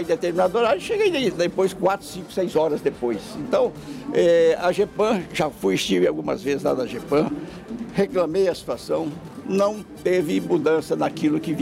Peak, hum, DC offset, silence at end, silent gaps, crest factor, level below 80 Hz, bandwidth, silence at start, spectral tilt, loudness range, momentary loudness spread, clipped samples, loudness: -10 dBFS; none; under 0.1%; 0 s; none; 12 dB; -54 dBFS; 16 kHz; 0 s; -5.5 dB/octave; 3 LU; 8 LU; under 0.1%; -22 LUFS